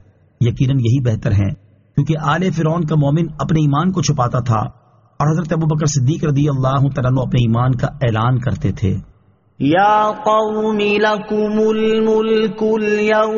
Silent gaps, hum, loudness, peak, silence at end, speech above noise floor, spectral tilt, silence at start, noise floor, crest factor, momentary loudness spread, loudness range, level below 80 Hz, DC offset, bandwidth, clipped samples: none; none; -16 LUFS; -4 dBFS; 0 s; 36 dB; -6.5 dB/octave; 0.4 s; -52 dBFS; 12 dB; 5 LU; 2 LU; -40 dBFS; under 0.1%; 7.2 kHz; under 0.1%